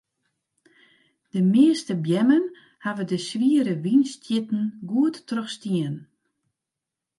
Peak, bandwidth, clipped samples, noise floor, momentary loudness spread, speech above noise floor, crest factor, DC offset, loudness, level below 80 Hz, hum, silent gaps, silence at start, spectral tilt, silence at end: -6 dBFS; 11.5 kHz; under 0.1%; -86 dBFS; 13 LU; 64 dB; 18 dB; under 0.1%; -23 LUFS; -76 dBFS; none; none; 1.35 s; -6.5 dB/octave; 1.15 s